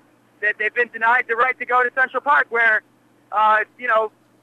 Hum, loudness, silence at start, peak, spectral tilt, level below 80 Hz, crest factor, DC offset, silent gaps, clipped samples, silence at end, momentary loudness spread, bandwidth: none; -18 LUFS; 0.4 s; -6 dBFS; -3 dB/octave; -80 dBFS; 14 dB; under 0.1%; none; under 0.1%; 0.35 s; 6 LU; 10.5 kHz